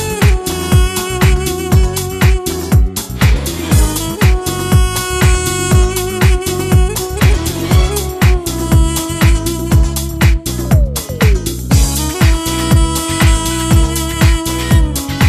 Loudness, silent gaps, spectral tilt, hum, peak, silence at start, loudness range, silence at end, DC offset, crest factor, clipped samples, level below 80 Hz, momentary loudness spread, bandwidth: -13 LUFS; none; -5 dB/octave; none; 0 dBFS; 0 s; 1 LU; 0 s; under 0.1%; 12 dB; under 0.1%; -16 dBFS; 4 LU; 14 kHz